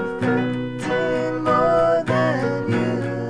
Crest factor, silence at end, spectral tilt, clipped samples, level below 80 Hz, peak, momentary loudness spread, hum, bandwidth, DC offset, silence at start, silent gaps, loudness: 14 dB; 0 s; -7 dB/octave; under 0.1%; -48 dBFS; -8 dBFS; 6 LU; none; 11 kHz; 0.5%; 0 s; none; -20 LUFS